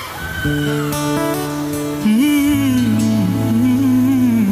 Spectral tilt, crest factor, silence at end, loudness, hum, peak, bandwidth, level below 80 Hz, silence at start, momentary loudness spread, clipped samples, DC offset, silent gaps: -6 dB/octave; 10 dB; 0 s; -16 LUFS; none; -6 dBFS; 15.5 kHz; -40 dBFS; 0 s; 8 LU; under 0.1%; under 0.1%; none